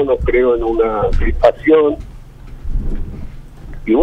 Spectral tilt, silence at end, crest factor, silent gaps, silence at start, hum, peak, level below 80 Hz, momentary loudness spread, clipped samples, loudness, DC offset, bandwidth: -8.5 dB/octave; 0 s; 14 dB; none; 0 s; none; 0 dBFS; -22 dBFS; 22 LU; under 0.1%; -15 LUFS; under 0.1%; 5.8 kHz